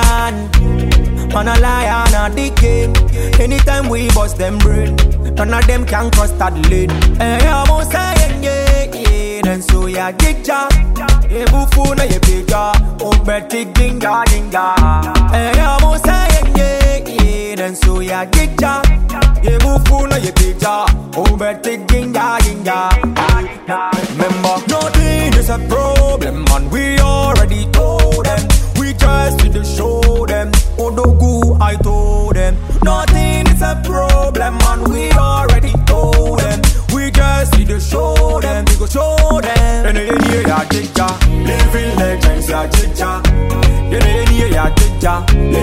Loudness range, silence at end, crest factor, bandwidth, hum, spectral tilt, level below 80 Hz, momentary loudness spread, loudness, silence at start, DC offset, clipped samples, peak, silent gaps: 1 LU; 0 s; 10 dB; 16 kHz; none; -5 dB/octave; -12 dBFS; 4 LU; -13 LUFS; 0 s; under 0.1%; under 0.1%; 0 dBFS; none